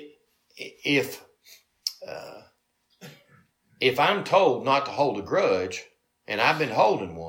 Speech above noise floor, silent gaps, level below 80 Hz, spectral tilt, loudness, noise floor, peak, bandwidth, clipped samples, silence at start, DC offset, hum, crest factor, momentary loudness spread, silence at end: 47 dB; none; -68 dBFS; -4.5 dB/octave; -24 LUFS; -70 dBFS; -6 dBFS; 17 kHz; under 0.1%; 0 s; under 0.1%; none; 20 dB; 18 LU; 0 s